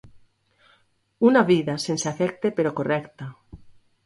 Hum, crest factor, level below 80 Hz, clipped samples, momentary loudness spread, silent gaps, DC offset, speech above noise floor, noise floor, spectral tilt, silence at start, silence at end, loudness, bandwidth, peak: none; 20 dB; -60 dBFS; under 0.1%; 17 LU; none; under 0.1%; 42 dB; -64 dBFS; -5.5 dB/octave; 0.05 s; 0.35 s; -22 LUFS; 11.5 kHz; -4 dBFS